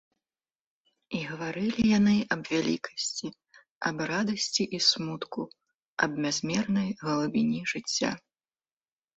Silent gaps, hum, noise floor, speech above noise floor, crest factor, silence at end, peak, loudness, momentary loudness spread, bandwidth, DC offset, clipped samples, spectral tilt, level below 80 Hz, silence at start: 3.70-3.81 s, 5.74-5.97 s; none; under -90 dBFS; over 62 dB; 20 dB; 1 s; -10 dBFS; -28 LUFS; 13 LU; 8 kHz; under 0.1%; under 0.1%; -4 dB/octave; -64 dBFS; 1.1 s